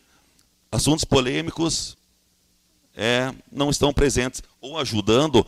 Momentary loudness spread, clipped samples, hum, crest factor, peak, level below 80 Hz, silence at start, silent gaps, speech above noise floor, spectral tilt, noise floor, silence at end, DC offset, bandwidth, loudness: 10 LU; under 0.1%; none; 18 dB; -6 dBFS; -38 dBFS; 0.7 s; none; 42 dB; -4 dB/octave; -64 dBFS; 0 s; under 0.1%; 15.5 kHz; -22 LUFS